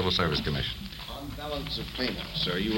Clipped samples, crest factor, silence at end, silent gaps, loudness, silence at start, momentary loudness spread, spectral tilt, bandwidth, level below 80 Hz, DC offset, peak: under 0.1%; 18 dB; 0 s; none; -31 LUFS; 0 s; 12 LU; -5 dB/octave; 17 kHz; -42 dBFS; under 0.1%; -12 dBFS